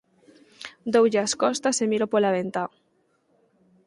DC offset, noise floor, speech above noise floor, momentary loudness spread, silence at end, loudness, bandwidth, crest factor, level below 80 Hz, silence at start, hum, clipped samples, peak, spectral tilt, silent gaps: under 0.1%; -68 dBFS; 45 dB; 15 LU; 1.2 s; -23 LUFS; 11.5 kHz; 18 dB; -70 dBFS; 0.6 s; none; under 0.1%; -8 dBFS; -3.5 dB/octave; none